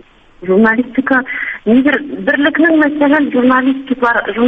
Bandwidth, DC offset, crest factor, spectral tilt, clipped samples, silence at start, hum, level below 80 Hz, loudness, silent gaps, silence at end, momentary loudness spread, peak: 4.5 kHz; under 0.1%; 12 dB; -7.5 dB/octave; under 0.1%; 0.4 s; none; -48 dBFS; -12 LUFS; none; 0 s; 6 LU; 0 dBFS